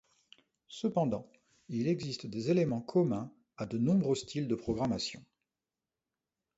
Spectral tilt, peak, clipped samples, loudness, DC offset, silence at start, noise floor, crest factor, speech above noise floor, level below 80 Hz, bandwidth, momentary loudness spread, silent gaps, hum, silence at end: -6.5 dB/octave; -18 dBFS; under 0.1%; -33 LUFS; under 0.1%; 0.7 s; under -90 dBFS; 18 dB; over 58 dB; -64 dBFS; 8 kHz; 11 LU; none; none; 1.35 s